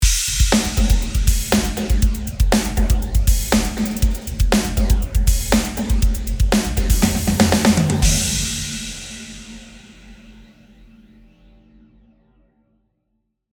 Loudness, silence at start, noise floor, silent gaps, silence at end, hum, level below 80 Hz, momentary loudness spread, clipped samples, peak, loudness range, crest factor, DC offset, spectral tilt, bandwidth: -19 LUFS; 0 s; -71 dBFS; none; 3.1 s; none; -22 dBFS; 9 LU; under 0.1%; 0 dBFS; 8 LU; 18 dB; under 0.1%; -4.5 dB/octave; over 20 kHz